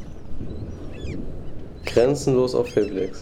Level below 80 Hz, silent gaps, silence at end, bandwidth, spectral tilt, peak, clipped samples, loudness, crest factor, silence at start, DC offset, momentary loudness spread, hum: -38 dBFS; none; 0 s; 16 kHz; -6.5 dB/octave; -6 dBFS; under 0.1%; -23 LUFS; 18 dB; 0 s; under 0.1%; 18 LU; none